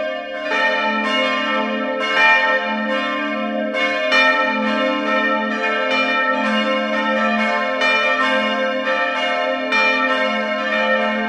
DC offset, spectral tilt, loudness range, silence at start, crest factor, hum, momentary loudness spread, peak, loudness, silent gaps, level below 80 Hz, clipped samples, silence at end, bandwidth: under 0.1%; -3.5 dB/octave; 1 LU; 0 s; 16 dB; none; 6 LU; -2 dBFS; -17 LUFS; none; -62 dBFS; under 0.1%; 0 s; 10.5 kHz